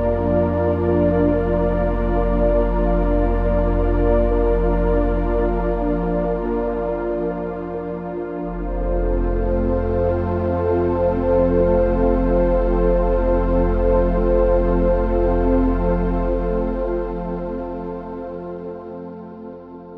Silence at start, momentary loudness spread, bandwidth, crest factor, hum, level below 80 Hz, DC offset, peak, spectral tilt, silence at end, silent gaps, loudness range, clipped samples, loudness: 0 s; 10 LU; 3.9 kHz; 14 dB; none; -24 dBFS; under 0.1%; -4 dBFS; -11 dB/octave; 0 s; none; 6 LU; under 0.1%; -20 LUFS